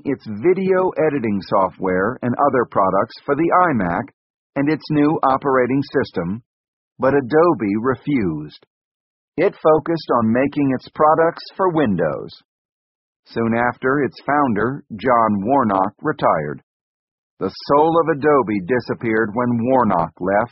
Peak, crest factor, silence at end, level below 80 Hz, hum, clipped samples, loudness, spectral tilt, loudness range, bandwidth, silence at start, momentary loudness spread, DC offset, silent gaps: -2 dBFS; 16 dB; 0.05 s; -52 dBFS; none; under 0.1%; -18 LUFS; -6 dB/octave; 2 LU; 5.8 kHz; 0.05 s; 9 LU; under 0.1%; 4.14-4.50 s, 6.46-6.96 s, 8.67-9.32 s, 12.45-13.23 s, 16.63-17.37 s